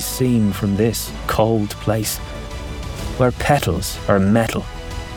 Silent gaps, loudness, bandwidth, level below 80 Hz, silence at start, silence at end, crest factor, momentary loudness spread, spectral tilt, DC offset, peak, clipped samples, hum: none; -19 LUFS; 19.5 kHz; -32 dBFS; 0 s; 0 s; 18 dB; 13 LU; -5.5 dB/octave; under 0.1%; -2 dBFS; under 0.1%; none